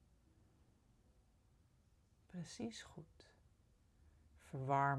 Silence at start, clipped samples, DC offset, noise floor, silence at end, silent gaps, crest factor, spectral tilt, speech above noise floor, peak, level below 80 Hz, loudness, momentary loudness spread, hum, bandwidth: 2.35 s; under 0.1%; under 0.1%; -73 dBFS; 0 s; none; 24 dB; -6 dB/octave; 31 dB; -24 dBFS; -74 dBFS; -46 LUFS; 20 LU; none; 12 kHz